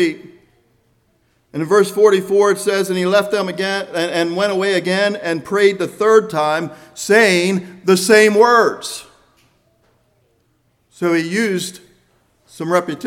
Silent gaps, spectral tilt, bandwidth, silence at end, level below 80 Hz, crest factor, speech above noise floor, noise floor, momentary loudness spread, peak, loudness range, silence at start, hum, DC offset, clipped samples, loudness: none; -4 dB/octave; 16.5 kHz; 0 s; -64 dBFS; 16 dB; 46 dB; -62 dBFS; 14 LU; 0 dBFS; 10 LU; 0 s; none; under 0.1%; under 0.1%; -15 LUFS